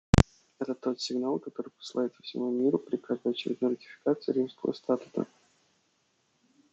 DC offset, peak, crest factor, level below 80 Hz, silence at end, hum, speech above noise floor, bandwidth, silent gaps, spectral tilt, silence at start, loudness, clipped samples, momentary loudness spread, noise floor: under 0.1%; -2 dBFS; 30 dB; -44 dBFS; 1.5 s; none; 42 dB; 8.2 kHz; none; -6.5 dB/octave; 0.15 s; -31 LUFS; under 0.1%; 9 LU; -73 dBFS